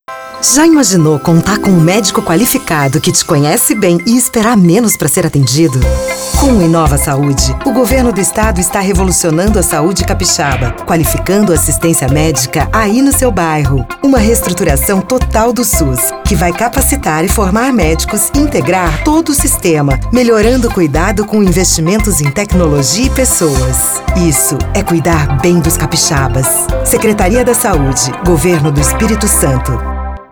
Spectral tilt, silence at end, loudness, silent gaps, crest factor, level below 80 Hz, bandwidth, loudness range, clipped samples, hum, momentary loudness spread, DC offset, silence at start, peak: -4.5 dB/octave; 0.05 s; -10 LUFS; none; 10 dB; -20 dBFS; over 20 kHz; 2 LU; under 0.1%; none; 4 LU; under 0.1%; 0.1 s; 0 dBFS